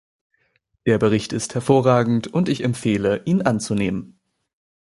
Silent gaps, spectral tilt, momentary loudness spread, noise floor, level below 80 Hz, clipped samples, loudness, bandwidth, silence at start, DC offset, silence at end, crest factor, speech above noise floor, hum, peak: none; -6 dB/octave; 8 LU; -67 dBFS; -52 dBFS; under 0.1%; -20 LUFS; 11.5 kHz; 0.85 s; under 0.1%; 0.9 s; 18 dB; 48 dB; none; -2 dBFS